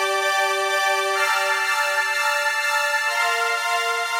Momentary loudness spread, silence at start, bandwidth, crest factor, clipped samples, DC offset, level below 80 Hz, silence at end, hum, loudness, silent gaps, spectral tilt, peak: 1 LU; 0 s; 16 kHz; 12 dB; under 0.1%; under 0.1%; under -90 dBFS; 0 s; none; -20 LUFS; none; 2 dB/octave; -8 dBFS